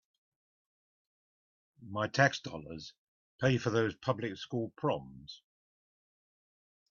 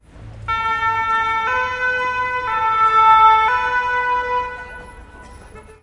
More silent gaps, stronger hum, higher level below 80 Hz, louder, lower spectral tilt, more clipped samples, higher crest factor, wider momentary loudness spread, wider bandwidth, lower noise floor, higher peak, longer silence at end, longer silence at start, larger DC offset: first, 2.98-3.39 s vs none; neither; second, -68 dBFS vs -44 dBFS; second, -33 LUFS vs -16 LUFS; first, -4.5 dB/octave vs -3 dB/octave; neither; first, 24 dB vs 16 dB; first, 21 LU vs 15 LU; second, 7.2 kHz vs 11 kHz; first, under -90 dBFS vs -40 dBFS; second, -12 dBFS vs -2 dBFS; first, 1.55 s vs 0.1 s; first, 1.8 s vs 0.15 s; neither